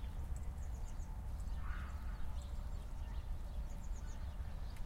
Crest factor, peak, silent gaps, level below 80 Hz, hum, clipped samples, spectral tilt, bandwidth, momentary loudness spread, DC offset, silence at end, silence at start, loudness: 12 dB; -30 dBFS; none; -44 dBFS; none; under 0.1%; -6 dB/octave; 16 kHz; 2 LU; under 0.1%; 0 s; 0 s; -48 LUFS